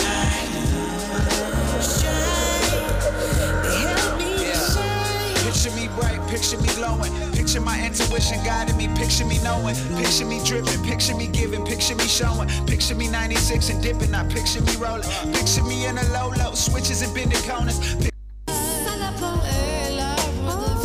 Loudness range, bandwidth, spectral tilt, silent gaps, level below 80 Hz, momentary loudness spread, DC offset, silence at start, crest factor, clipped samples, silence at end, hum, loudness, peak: 2 LU; 16 kHz; -3.5 dB/octave; none; -28 dBFS; 4 LU; under 0.1%; 0 s; 14 dB; under 0.1%; 0 s; none; -22 LUFS; -8 dBFS